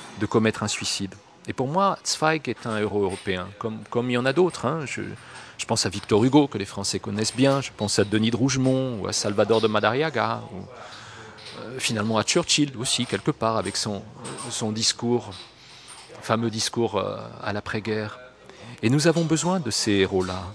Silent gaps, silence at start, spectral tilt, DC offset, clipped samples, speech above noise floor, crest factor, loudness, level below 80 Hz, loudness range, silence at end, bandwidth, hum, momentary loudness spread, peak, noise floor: none; 0 s; -4 dB/octave; under 0.1%; under 0.1%; 21 dB; 22 dB; -24 LUFS; -58 dBFS; 4 LU; 0 s; 11 kHz; none; 18 LU; -4 dBFS; -45 dBFS